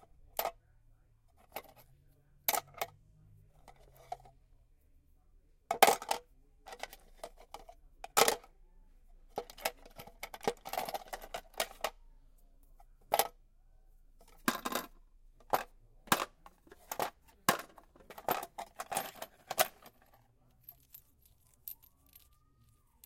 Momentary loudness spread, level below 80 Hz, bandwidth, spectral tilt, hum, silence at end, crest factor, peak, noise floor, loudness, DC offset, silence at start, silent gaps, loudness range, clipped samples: 23 LU; -62 dBFS; 16.5 kHz; -1.5 dB/octave; none; 1.3 s; 38 dB; -2 dBFS; -68 dBFS; -36 LUFS; under 0.1%; 0.35 s; none; 7 LU; under 0.1%